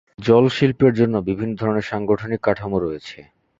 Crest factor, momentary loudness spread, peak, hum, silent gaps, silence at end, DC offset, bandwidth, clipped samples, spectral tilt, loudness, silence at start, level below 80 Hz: 18 dB; 9 LU; -2 dBFS; none; none; 0.4 s; under 0.1%; 7.8 kHz; under 0.1%; -8 dB/octave; -19 LUFS; 0.2 s; -48 dBFS